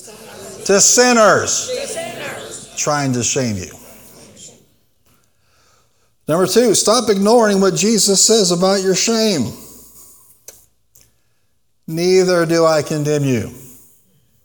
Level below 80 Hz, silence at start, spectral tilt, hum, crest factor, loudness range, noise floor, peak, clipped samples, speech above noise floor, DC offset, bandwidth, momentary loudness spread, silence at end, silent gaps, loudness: -56 dBFS; 0.05 s; -3 dB/octave; none; 16 dB; 10 LU; -67 dBFS; 0 dBFS; under 0.1%; 53 dB; 0.1%; 19.5 kHz; 17 LU; 0.75 s; none; -14 LUFS